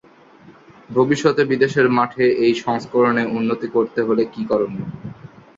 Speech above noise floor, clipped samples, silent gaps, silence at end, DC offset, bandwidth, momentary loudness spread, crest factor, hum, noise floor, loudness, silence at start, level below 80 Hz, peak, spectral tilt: 29 dB; under 0.1%; none; 0.3 s; under 0.1%; 7.8 kHz; 9 LU; 16 dB; none; -47 dBFS; -18 LUFS; 0.45 s; -58 dBFS; -2 dBFS; -6.5 dB/octave